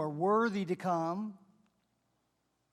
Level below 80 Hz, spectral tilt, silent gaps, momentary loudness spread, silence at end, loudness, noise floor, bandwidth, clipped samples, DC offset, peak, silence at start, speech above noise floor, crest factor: -84 dBFS; -7.5 dB/octave; none; 10 LU; 1.35 s; -33 LUFS; -79 dBFS; 12.5 kHz; under 0.1%; under 0.1%; -18 dBFS; 0 s; 47 dB; 16 dB